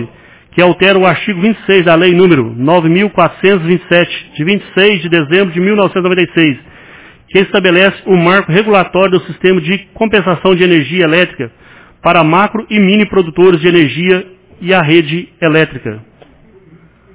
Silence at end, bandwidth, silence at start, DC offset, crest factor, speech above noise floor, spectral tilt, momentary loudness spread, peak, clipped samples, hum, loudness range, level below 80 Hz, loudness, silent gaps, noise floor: 1.15 s; 4 kHz; 0 s; under 0.1%; 10 dB; 33 dB; -10 dB/octave; 7 LU; 0 dBFS; 0.6%; none; 2 LU; -46 dBFS; -10 LUFS; none; -42 dBFS